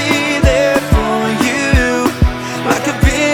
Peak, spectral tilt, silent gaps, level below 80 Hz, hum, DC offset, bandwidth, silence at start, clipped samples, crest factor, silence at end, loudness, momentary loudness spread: 0 dBFS; -5 dB/octave; none; -20 dBFS; none; under 0.1%; 19.5 kHz; 0 s; under 0.1%; 12 dB; 0 s; -13 LUFS; 4 LU